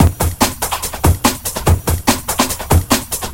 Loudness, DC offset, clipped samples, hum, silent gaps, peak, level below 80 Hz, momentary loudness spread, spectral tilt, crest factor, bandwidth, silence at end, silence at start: -16 LUFS; 0.2%; under 0.1%; none; none; 0 dBFS; -24 dBFS; 3 LU; -4 dB/octave; 16 dB; 17.5 kHz; 0 s; 0 s